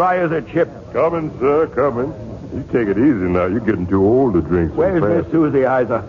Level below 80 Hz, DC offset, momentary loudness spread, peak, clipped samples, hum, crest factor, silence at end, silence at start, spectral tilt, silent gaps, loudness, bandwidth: -40 dBFS; under 0.1%; 6 LU; -4 dBFS; under 0.1%; none; 12 dB; 0 s; 0 s; -10 dB/octave; none; -17 LUFS; 7 kHz